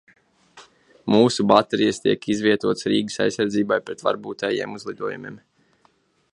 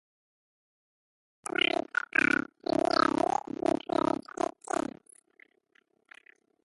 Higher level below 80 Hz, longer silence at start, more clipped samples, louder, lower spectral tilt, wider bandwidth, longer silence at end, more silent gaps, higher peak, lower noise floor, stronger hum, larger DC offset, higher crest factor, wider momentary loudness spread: first, -62 dBFS vs -68 dBFS; second, 0.55 s vs 1.45 s; neither; first, -21 LUFS vs -29 LUFS; first, -5 dB/octave vs -3.5 dB/octave; about the same, 11.5 kHz vs 11.5 kHz; second, 0.95 s vs 3.55 s; neither; first, 0 dBFS vs -10 dBFS; second, -62 dBFS vs -70 dBFS; neither; neither; about the same, 22 dB vs 22 dB; first, 13 LU vs 9 LU